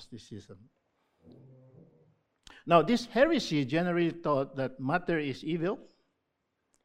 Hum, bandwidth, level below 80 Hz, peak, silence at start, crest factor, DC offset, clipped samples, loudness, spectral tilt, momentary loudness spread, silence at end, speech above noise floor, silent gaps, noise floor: none; 12.5 kHz; -62 dBFS; -8 dBFS; 0 s; 24 dB; under 0.1%; under 0.1%; -29 LUFS; -6 dB/octave; 21 LU; 1 s; 51 dB; none; -81 dBFS